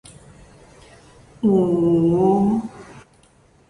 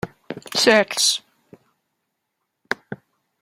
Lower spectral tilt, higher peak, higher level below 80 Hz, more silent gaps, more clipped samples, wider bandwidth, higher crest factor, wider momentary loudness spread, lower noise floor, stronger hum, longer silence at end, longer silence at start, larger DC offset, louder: first, -9.5 dB/octave vs -1.5 dB/octave; second, -6 dBFS vs -2 dBFS; first, -50 dBFS vs -64 dBFS; neither; neither; second, 11 kHz vs 16 kHz; second, 16 dB vs 22 dB; second, 8 LU vs 22 LU; second, -54 dBFS vs -77 dBFS; neither; first, 0.7 s vs 0.45 s; first, 1.4 s vs 0.05 s; neither; about the same, -18 LUFS vs -19 LUFS